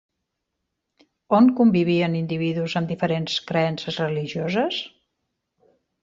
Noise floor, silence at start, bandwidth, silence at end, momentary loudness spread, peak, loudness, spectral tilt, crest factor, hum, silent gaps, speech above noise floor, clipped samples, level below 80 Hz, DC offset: -79 dBFS; 1.3 s; 7.6 kHz; 1.15 s; 9 LU; -6 dBFS; -22 LUFS; -7 dB/octave; 18 dB; none; none; 58 dB; under 0.1%; -64 dBFS; under 0.1%